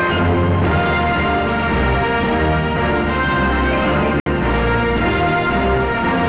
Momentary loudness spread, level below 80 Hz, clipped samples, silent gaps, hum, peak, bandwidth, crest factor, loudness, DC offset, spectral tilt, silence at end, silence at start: 1 LU; -26 dBFS; under 0.1%; 4.20-4.26 s; none; -10 dBFS; 4 kHz; 6 dB; -17 LUFS; 0.7%; -10 dB/octave; 0 s; 0 s